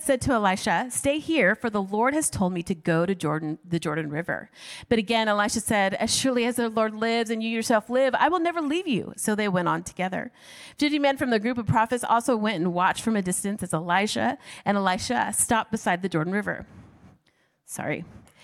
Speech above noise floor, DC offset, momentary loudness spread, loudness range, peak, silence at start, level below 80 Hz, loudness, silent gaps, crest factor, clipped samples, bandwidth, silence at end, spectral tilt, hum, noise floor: 42 dB; under 0.1%; 8 LU; 3 LU; -6 dBFS; 0 s; -56 dBFS; -25 LUFS; none; 18 dB; under 0.1%; 16 kHz; 0.25 s; -4 dB/octave; none; -67 dBFS